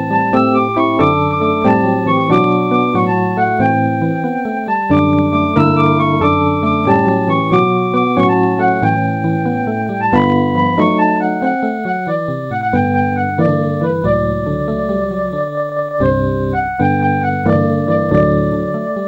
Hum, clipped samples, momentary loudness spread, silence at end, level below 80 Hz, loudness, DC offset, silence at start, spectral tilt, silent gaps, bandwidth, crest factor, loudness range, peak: none; under 0.1%; 6 LU; 0 s; -38 dBFS; -14 LUFS; under 0.1%; 0 s; -9 dB/octave; none; 16.5 kHz; 12 dB; 3 LU; -2 dBFS